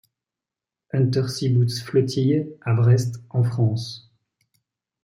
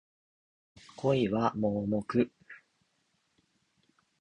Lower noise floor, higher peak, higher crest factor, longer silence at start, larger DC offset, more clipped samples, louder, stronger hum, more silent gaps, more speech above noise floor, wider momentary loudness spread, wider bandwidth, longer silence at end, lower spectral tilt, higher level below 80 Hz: first, -88 dBFS vs -75 dBFS; first, -6 dBFS vs -12 dBFS; second, 16 dB vs 22 dB; about the same, 0.95 s vs 1 s; neither; neither; first, -22 LUFS vs -30 LUFS; neither; neither; first, 68 dB vs 46 dB; first, 9 LU vs 5 LU; first, 12 kHz vs 10 kHz; second, 1.05 s vs 1.65 s; about the same, -7 dB/octave vs -8 dB/octave; about the same, -62 dBFS vs -64 dBFS